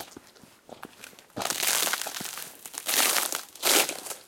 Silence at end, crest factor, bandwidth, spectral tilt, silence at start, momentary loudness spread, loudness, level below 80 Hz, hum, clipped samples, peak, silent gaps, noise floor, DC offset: 0.05 s; 26 dB; 17 kHz; 0.5 dB/octave; 0 s; 23 LU; -25 LUFS; -74 dBFS; none; under 0.1%; -4 dBFS; none; -55 dBFS; under 0.1%